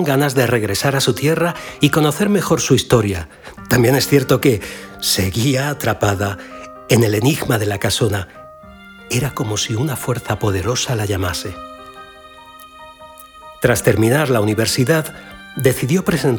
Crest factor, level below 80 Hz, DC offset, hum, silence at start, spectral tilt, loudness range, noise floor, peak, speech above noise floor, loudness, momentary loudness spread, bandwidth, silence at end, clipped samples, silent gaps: 18 dB; -44 dBFS; under 0.1%; none; 0 s; -5 dB/octave; 6 LU; -40 dBFS; 0 dBFS; 24 dB; -17 LUFS; 16 LU; over 20 kHz; 0 s; under 0.1%; none